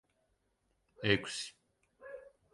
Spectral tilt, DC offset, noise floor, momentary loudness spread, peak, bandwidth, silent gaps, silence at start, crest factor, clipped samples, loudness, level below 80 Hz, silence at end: -4 dB/octave; under 0.1%; -79 dBFS; 21 LU; -14 dBFS; 11.5 kHz; none; 1 s; 26 dB; under 0.1%; -35 LUFS; -66 dBFS; 0.25 s